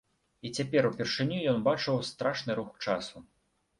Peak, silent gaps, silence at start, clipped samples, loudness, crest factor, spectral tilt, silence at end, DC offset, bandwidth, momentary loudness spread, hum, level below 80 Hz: -12 dBFS; none; 0.45 s; under 0.1%; -31 LUFS; 20 dB; -5.5 dB/octave; 0.55 s; under 0.1%; 11.5 kHz; 8 LU; none; -66 dBFS